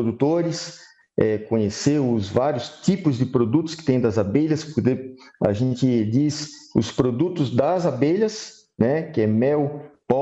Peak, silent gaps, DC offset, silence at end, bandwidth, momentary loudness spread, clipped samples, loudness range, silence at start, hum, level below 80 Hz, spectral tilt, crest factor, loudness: -6 dBFS; none; under 0.1%; 0 s; 8.2 kHz; 7 LU; under 0.1%; 1 LU; 0 s; none; -54 dBFS; -7 dB/octave; 16 dB; -22 LUFS